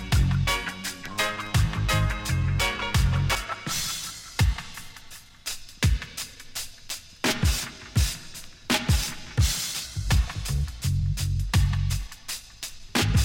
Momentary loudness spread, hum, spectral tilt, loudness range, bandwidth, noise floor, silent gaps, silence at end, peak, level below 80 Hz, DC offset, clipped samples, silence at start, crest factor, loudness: 12 LU; none; -4 dB/octave; 4 LU; 17 kHz; -45 dBFS; none; 0 s; -10 dBFS; -32 dBFS; under 0.1%; under 0.1%; 0 s; 16 dB; -27 LUFS